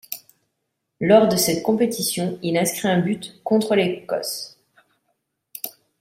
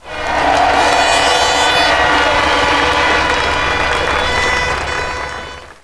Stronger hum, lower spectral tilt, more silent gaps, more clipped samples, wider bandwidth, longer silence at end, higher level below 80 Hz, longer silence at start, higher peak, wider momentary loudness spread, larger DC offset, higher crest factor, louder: neither; first, -4.5 dB/octave vs -2.5 dB/octave; neither; neither; first, 16 kHz vs 11 kHz; first, 0.3 s vs 0.1 s; second, -62 dBFS vs -30 dBFS; about the same, 0.1 s vs 0.05 s; about the same, -2 dBFS vs 0 dBFS; first, 18 LU vs 8 LU; second, under 0.1% vs 0.4%; first, 20 dB vs 14 dB; second, -20 LUFS vs -12 LUFS